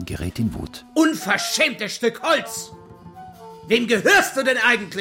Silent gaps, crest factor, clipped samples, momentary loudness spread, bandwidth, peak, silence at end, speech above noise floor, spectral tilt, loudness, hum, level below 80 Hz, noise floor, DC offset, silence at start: none; 18 dB; under 0.1%; 15 LU; 16.5 kHz; -4 dBFS; 0 s; 21 dB; -3.5 dB/octave; -19 LUFS; none; -46 dBFS; -41 dBFS; under 0.1%; 0 s